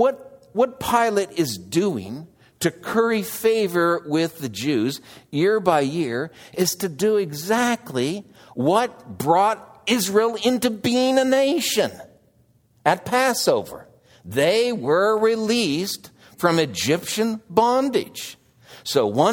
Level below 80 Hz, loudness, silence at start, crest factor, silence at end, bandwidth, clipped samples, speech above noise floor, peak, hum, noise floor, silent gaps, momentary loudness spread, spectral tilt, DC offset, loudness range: -62 dBFS; -21 LUFS; 0 s; 20 dB; 0 s; 20 kHz; under 0.1%; 39 dB; 0 dBFS; none; -59 dBFS; none; 10 LU; -4 dB/octave; under 0.1%; 3 LU